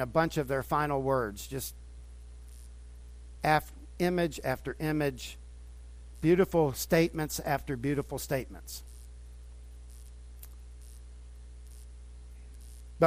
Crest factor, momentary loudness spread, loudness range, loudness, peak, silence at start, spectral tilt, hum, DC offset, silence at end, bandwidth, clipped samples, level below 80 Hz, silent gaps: 24 dB; 23 LU; 20 LU; -31 LUFS; -10 dBFS; 0 s; -5.5 dB/octave; 60 Hz at -45 dBFS; under 0.1%; 0 s; 15.5 kHz; under 0.1%; -48 dBFS; none